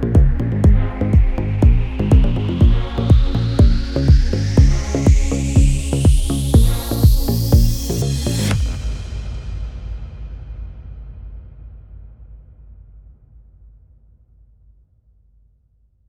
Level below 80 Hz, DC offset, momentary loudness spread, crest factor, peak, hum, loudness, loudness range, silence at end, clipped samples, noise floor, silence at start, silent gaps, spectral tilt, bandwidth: -18 dBFS; under 0.1%; 18 LU; 16 dB; 0 dBFS; none; -17 LUFS; 18 LU; 3.7 s; under 0.1%; -58 dBFS; 0 s; none; -6.5 dB/octave; 18 kHz